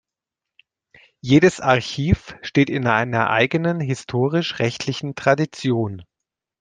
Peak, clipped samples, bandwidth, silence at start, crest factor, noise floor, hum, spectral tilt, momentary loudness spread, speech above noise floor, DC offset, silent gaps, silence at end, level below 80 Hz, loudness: -2 dBFS; under 0.1%; 9.6 kHz; 1.25 s; 20 dB; -86 dBFS; none; -6 dB/octave; 9 LU; 67 dB; under 0.1%; none; 0.6 s; -44 dBFS; -20 LUFS